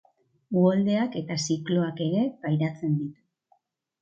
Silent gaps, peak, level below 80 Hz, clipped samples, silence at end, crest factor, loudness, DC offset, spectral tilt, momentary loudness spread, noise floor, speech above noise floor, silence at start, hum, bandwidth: none; -10 dBFS; -72 dBFS; under 0.1%; 0.9 s; 16 dB; -26 LUFS; under 0.1%; -6.5 dB/octave; 8 LU; -68 dBFS; 43 dB; 0.5 s; none; 8.4 kHz